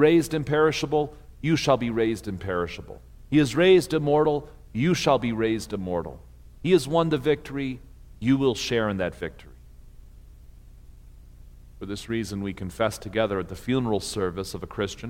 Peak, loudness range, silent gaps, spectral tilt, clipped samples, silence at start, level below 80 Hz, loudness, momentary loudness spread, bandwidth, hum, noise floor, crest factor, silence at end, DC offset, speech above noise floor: -6 dBFS; 11 LU; none; -6 dB/octave; under 0.1%; 0 s; -46 dBFS; -25 LUFS; 13 LU; 16.5 kHz; 60 Hz at -50 dBFS; -47 dBFS; 20 dB; 0 s; under 0.1%; 23 dB